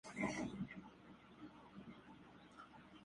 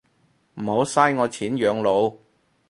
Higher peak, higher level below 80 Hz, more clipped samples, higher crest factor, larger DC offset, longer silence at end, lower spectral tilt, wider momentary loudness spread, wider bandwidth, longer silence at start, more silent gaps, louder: second, -28 dBFS vs -2 dBFS; second, -72 dBFS vs -62 dBFS; neither; about the same, 22 dB vs 20 dB; neither; second, 0 s vs 0.55 s; about the same, -5 dB/octave vs -5 dB/octave; first, 18 LU vs 7 LU; about the same, 11.5 kHz vs 11.5 kHz; second, 0.05 s vs 0.55 s; neither; second, -51 LUFS vs -22 LUFS